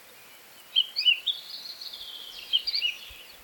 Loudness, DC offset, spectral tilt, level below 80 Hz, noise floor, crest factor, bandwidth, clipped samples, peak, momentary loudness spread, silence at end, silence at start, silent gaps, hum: -26 LUFS; under 0.1%; 2 dB/octave; -66 dBFS; -51 dBFS; 20 dB; 18.5 kHz; under 0.1%; -12 dBFS; 16 LU; 0 s; 0 s; none; none